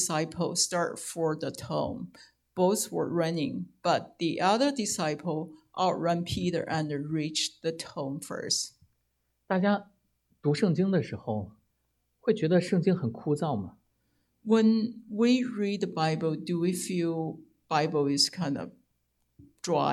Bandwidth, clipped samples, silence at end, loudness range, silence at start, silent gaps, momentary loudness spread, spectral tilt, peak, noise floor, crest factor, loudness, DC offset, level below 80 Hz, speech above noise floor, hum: 15 kHz; under 0.1%; 0 s; 3 LU; 0 s; none; 11 LU; -4.5 dB/octave; -12 dBFS; -77 dBFS; 18 dB; -29 LUFS; under 0.1%; -66 dBFS; 48 dB; none